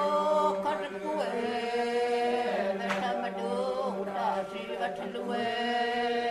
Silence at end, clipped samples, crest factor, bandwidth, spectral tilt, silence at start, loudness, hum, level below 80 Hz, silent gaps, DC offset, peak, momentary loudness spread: 0 s; under 0.1%; 14 dB; 13 kHz; -4.5 dB/octave; 0 s; -30 LUFS; none; -68 dBFS; none; under 0.1%; -16 dBFS; 7 LU